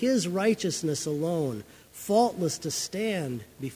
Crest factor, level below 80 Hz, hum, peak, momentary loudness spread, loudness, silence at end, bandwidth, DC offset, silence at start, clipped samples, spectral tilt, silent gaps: 18 dB; -64 dBFS; none; -10 dBFS; 12 LU; -28 LUFS; 0 s; 16 kHz; under 0.1%; 0 s; under 0.1%; -4.5 dB/octave; none